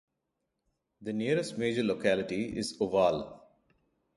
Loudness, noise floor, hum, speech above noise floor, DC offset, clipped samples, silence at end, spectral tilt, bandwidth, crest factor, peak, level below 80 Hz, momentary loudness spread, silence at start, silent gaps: -31 LUFS; -83 dBFS; none; 53 dB; under 0.1%; under 0.1%; 0.75 s; -5.5 dB/octave; 11.5 kHz; 20 dB; -12 dBFS; -64 dBFS; 10 LU; 1 s; none